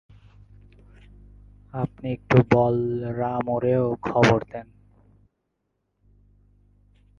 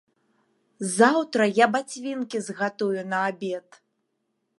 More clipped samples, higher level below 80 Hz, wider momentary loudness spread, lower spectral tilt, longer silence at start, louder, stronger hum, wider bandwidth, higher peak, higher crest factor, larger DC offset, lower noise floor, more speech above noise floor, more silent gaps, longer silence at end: neither; first, -50 dBFS vs -78 dBFS; about the same, 14 LU vs 13 LU; first, -7.5 dB/octave vs -4 dB/octave; first, 1.75 s vs 0.8 s; about the same, -23 LUFS vs -24 LUFS; first, 50 Hz at -45 dBFS vs none; second, 7.4 kHz vs 11.5 kHz; about the same, -2 dBFS vs -4 dBFS; about the same, 24 dB vs 22 dB; neither; about the same, -76 dBFS vs -76 dBFS; about the same, 54 dB vs 52 dB; neither; first, 2.55 s vs 1 s